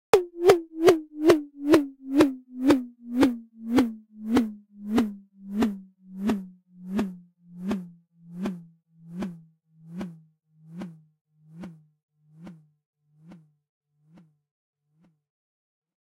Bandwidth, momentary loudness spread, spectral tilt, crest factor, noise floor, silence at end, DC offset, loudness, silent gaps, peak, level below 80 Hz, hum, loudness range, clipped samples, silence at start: 16 kHz; 23 LU; -6 dB/octave; 22 dB; -66 dBFS; 2.65 s; under 0.1%; -25 LUFS; 11.21-11.25 s, 12.03-12.09 s, 12.86-12.93 s; -6 dBFS; -58 dBFS; none; 22 LU; under 0.1%; 0.15 s